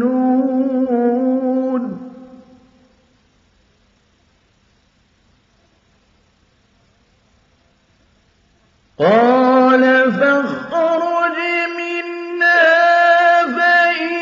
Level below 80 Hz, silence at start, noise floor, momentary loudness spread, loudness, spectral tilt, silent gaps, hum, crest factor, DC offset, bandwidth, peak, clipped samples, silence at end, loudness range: -64 dBFS; 0 s; -57 dBFS; 11 LU; -14 LUFS; -2.5 dB/octave; none; none; 16 dB; under 0.1%; 7.4 kHz; 0 dBFS; under 0.1%; 0 s; 11 LU